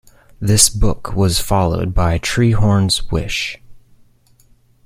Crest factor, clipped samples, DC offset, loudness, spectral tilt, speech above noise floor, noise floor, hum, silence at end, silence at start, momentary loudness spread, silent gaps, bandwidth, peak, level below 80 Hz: 16 dB; under 0.1%; under 0.1%; -16 LUFS; -4 dB/octave; 37 dB; -52 dBFS; none; 1.05 s; 0.4 s; 10 LU; none; 16.5 kHz; 0 dBFS; -26 dBFS